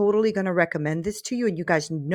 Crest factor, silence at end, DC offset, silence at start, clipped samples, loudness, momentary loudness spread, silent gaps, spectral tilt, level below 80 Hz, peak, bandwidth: 16 dB; 0 s; under 0.1%; 0 s; under 0.1%; -24 LUFS; 5 LU; none; -6 dB/octave; -58 dBFS; -8 dBFS; 14.5 kHz